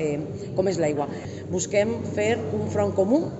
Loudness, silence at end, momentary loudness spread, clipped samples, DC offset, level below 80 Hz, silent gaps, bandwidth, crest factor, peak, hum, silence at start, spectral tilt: -25 LUFS; 0 s; 8 LU; under 0.1%; under 0.1%; -56 dBFS; none; 8.2 kHz; 16 dB; -8 dBFS; none; 0 s; -6 dB/octave